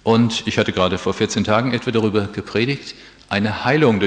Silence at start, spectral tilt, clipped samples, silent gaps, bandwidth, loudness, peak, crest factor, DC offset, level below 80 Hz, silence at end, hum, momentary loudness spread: 0.05 s; -5.5 dB/octave; under 0.1%; none; 9.6 kHz; -19 LUFS; -2 dBFS; 18 dB; under 0.1%; -50 dBFS; 0 s; none; 7 LU